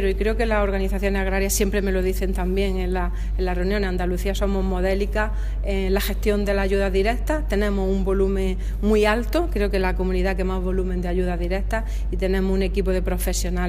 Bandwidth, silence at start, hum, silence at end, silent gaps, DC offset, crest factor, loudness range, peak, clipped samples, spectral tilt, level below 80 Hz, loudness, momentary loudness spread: 16 kHz; 0 s; none; 0 s; none; under 0.1%; 16 dB; 2 LU; -4 dBFS; under 0.1%; -5.5 dB/octave; -24 dBFS; -23 LUFS; 4 LU